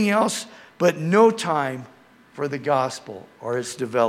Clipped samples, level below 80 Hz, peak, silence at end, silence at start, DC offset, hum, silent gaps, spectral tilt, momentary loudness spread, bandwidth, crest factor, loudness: under 0.1%; -72 dBFS; -4 dBFS; 0 s; 0 s; under 0.1%; none; none; -5 dB/octave; 18 LU; 15.5 kHz; 18 dB; -22 LUFS